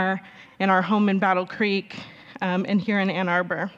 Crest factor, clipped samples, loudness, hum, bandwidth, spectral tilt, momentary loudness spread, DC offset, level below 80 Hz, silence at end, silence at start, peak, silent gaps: 18 dB; under 0.1%; -23 LUFS; none; 7.2 kHz; -7.5 dB/octave; 11 LU; under 0.1%; -70 dBFS; 0.05 s; 0 s; -6 dBFS; none